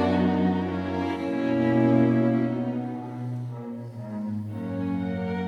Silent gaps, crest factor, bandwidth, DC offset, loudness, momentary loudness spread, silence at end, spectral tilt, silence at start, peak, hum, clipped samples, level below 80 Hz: none; 16 dB; 7.2 kHz; under 0.1%; -26 LUFS; 13 LU; 0 s; -9 dB/octave; 0 s; -10 dBFS; none; under 0.1%; -60 dBFS